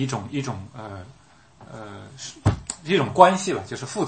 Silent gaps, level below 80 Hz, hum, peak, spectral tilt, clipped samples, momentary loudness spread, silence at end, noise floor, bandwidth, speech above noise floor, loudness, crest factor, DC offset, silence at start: none; -46 dBFS; none; 0 dBFS; -5 dB/octave; under 0.1%; 24 LU; 0 s; -50 dBFS; 8.8 kHz; 27 dB; -22 LUFS; 24 dB; under 0.1%; 0 s